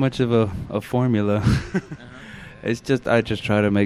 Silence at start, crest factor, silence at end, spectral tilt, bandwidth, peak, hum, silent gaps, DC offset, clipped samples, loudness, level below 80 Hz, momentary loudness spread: 0 s; 16 dB; 0 s; -7 dB/octave; 13.5 kHz; -6 dBFS; none; none; under 0.1%; under 0.1%; -22 LUFS; -40 dBFS; 19 LU